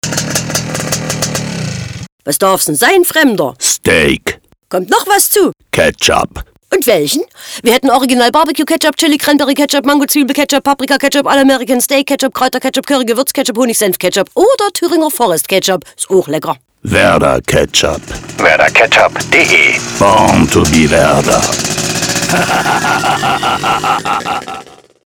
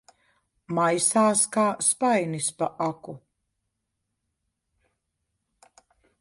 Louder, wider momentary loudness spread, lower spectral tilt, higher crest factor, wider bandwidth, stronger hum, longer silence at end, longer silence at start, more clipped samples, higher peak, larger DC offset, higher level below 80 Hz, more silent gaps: first, -10 LUFS vs -23 LUFS; about the same, 9 LU vs 11 LU; about the same, -3 dB/octave vs -3.5 dB/octave; second, 12 dB vs 18 dB; first, over 20 kHz vs 11.5 kHz; neither; second, 0.45 s vs 3.05 s; second, 0.05 s vs 0.7 s; first, 0.1% vs under 0.1%; first, 0 dBFS vs -10 dBFS; neither; first, -36 dBFS vs -72 dBFS; first, 2.12-2.18 s vs none